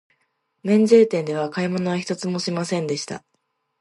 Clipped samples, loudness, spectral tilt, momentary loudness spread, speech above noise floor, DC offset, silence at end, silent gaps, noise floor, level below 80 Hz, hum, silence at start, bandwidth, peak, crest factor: under 0.1%; -21 LUFS; -6 dB/octave; 14 LU; 52 dB; under 0.1%; 0.65 s; none; -73 dBFS; -70 dBFS; none; 0.65 s; 11.5 kHz; -2 dBFS; 18 dB